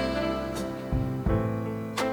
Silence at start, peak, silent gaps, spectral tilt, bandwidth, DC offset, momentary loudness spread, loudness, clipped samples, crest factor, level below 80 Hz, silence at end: 0 s; -14 dBFS; none; -6.5 dB/octave; over 20 kHz; under 0.1%; 5 LU; -30 LUFS; under 0.1%; 16 dB; -38 dBFS; 0 s